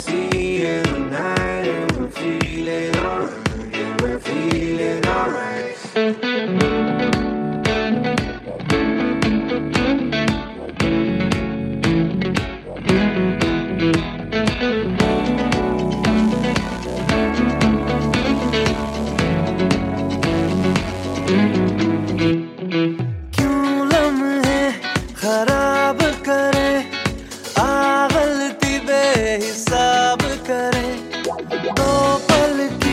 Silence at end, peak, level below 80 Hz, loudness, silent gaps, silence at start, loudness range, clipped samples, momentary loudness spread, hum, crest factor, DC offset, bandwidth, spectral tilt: 0 s; 0 dBFS; -36 dBFS; -19 LUFS; none; 0 s; 4 LU; under 0.1%; 7 LU; none; 18 dB; under 0.1%; 16 kHz; -5.5 dB/octave